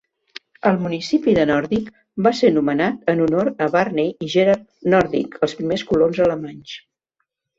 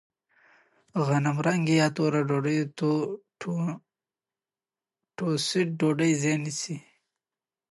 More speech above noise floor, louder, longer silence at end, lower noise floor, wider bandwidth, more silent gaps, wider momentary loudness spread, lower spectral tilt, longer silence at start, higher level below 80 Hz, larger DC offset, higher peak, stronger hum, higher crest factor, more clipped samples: second, 57 dB vs over 64 dB; first, -19 LUFS vs -27 LUFS; second, 0.8 s vs 0.95 s; second, -76 dBFS vs under -90 dBFS; second, 7.8 kHz vs 11.5 kHz; neither; first, 15 LU vs 11 LU; about the same, -6.5 dB/octave vs -5.5 dB/octave; second, 0.65 s vs 0.95 s; first, -52 dBFS vs -74 dBFS; neither; first, -2 dBFS vs -12 dBFS; neither; about the same, 18 dB vs 18 dB; neither